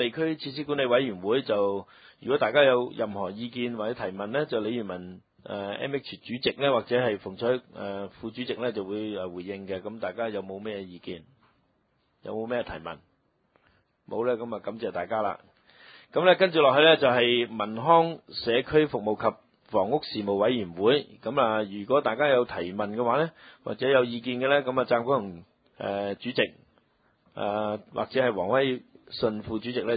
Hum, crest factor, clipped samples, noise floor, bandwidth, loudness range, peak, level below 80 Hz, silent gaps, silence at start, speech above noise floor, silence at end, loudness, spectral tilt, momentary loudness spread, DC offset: none; 22 dB; under 0.1%; -71 dBFS; 5 kHz; 12 LU; -6 dBFS; -62 dBFS; none; 0 s; 44 dB; 0 s; -27 LUFS; -9.5 dB/octave; 15 LU; under 0.1%